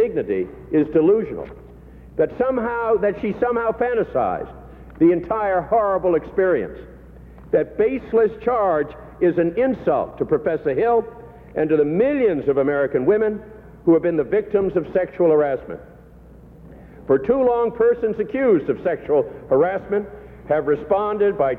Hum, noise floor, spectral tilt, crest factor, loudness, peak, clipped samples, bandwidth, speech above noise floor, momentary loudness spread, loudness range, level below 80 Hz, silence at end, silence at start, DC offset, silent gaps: none; -44 dBFS; -10 dB/octave; 14 dB; -20 LUFS; -6 dBFS; under 0.1%; 4.1 kHz; 25 dB; 8 LU; 2 LU; -46 dBFS; 0 s; 0 s; under 0.1%; none